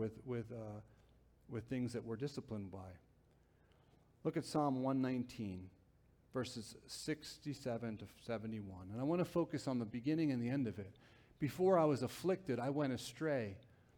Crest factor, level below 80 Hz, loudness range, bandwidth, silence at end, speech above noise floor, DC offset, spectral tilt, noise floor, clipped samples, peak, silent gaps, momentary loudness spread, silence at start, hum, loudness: 20 dB; -72 dBFS; 9 LU; 19.5 kHz; 0.35 s; 31 dB; under 0.1%; -6.5 dB/octave; -71 dBFS; under 0.1%; -20 dBFS; none; 13 LU; 0 s; none; -41 LUFS